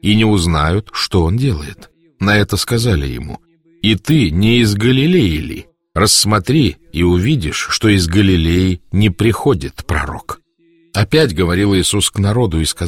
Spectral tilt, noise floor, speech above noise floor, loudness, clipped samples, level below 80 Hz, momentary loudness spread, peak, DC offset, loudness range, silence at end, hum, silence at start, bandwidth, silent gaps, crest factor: -5 dB/octave; -53 dBFS; 40 dB; -14 LUFS; under 0.1%; -30 dBFS; 12 LU; 0 dBFS; 0.3%; 3 LU; 0 s; none; 0.05 s; 16.5 kHz; none; 14 dB